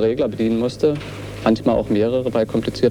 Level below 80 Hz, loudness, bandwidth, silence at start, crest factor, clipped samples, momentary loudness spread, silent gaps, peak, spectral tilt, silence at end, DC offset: -42 dBFS; -20 LUFS; 13 kHz; 0 s; 16 dB; under 0.1%; 4 LU; none; -2 dBFS; -7 dB/octave; 0 s; under 0.1%